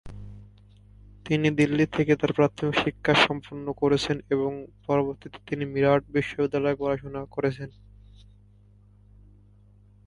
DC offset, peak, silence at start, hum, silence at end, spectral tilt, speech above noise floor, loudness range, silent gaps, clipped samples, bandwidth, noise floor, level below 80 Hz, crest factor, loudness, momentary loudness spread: under 0.1%; -4 dBFS; 0.05 s; 50 Hz at -50 dBFS; 2.35 s; -6 dB/octave; 30 dB; 7 LU; none; under 0.1%; 11.5 kHz; -55 dBFS; -52 dBFS; 22 dB; -25 LUFS; 16 LU